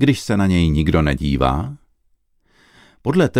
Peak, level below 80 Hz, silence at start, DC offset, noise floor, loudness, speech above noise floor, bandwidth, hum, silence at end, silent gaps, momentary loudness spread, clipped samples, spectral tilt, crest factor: -2 dBFS; -30 dBFS; 0 s; under 0.1%; -62 dBFS; -18 LUFS; 45 dB; 15.5 kHz; none; 0 s; none; 9 LU; under 0.1%; -7 dB/octave; 16 dB